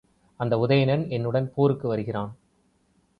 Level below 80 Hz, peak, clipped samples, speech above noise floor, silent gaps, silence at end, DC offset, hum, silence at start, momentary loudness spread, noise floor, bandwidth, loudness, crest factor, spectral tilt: -58 dBFS; -8 dBFS; under 0.1%; 42 dB; none; 0.85 s; under 0.1%; none; 0.4 s; 11 LU; -66 dBFS; 5.2 kHz; -25 LUFS; 18 dB; -9.5 dB/octave